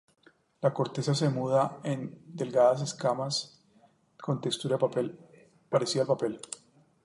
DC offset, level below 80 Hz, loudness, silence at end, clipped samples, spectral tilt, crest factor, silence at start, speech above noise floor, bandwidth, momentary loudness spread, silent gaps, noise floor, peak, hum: under 0.1%; -74 dBFS; -29 LUFS; 0.5 s; under 0.1%; -5.5 dB/octave; 18 dB; 0.6 s; 35 dB; 11.5 kHz; 14 LU; none; -64 dBFS; -12 dBFS; none